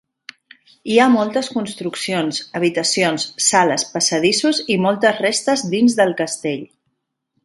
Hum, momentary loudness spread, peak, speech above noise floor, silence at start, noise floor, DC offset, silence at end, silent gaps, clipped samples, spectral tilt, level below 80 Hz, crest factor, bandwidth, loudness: none; 10 LU; 0 dBFS; 55 dB; 0.85 s; -72 dBFS; under 0.1%; 0.8 s; none; under 0.1%; -3 dB/octave; -64 dBFS; 18 dB; 11.5 kHz; -17 LUFS